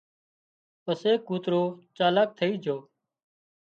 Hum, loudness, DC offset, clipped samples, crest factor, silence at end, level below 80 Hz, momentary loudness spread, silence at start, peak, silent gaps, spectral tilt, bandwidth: none; -27 LUFS; under 0.1%; under 0.1%; 18 dB; 0.9 s; -78 dBFS; 10 LU; 0.85 s; -10 dBFS; none; -7 dB/octave; 7.6 kHz